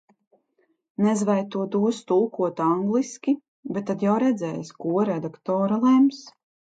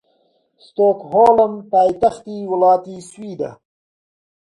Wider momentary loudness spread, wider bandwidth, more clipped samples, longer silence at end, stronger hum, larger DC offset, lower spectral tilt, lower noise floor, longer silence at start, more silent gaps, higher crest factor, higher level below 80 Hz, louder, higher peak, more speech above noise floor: second, 11 LU vs 18 LU; second, 9.2 kHz vs 11 kHz; neither; second, 0.4 s vs 0.95 s; neither; neither; about the same, -7 dB/octave vs -7 dB/octave; first, -69 dBFS vs -62 dBFS; first, 1 s vs 0.8 s; first, 3.48-3.63 s vs none; about the same, 14 dB vs 16 dB; second, -72 dBFS vs -58 dBFS; second, -24 LUFS vs -16 LUFS; second, -10 dBFS vs 0 dBFS; about the same, 46 dB vs 46 dB